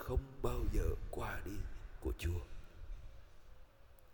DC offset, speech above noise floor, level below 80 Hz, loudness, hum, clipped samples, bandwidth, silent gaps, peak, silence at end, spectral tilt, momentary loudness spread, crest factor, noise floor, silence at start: under 0.1%; 22 dB; -44 dBFS; -43 LUFS; none; under 0.1%; 19 kHz; none; -22 dBFS; 0 s; -6.5 dB/octave; 20 LU; 18 dB; -61 dBFS; 0 s